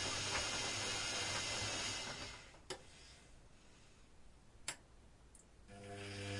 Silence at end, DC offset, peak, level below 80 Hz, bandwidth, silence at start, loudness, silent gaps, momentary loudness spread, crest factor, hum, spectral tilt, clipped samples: 0 s; under 0.1%; -26 dBFS; -64 dBFS; 11.5 kHz; 0 s; -41 LUFS; none; 23 LU; 20 dB; none; -1.5 dB/octave; under 0.1%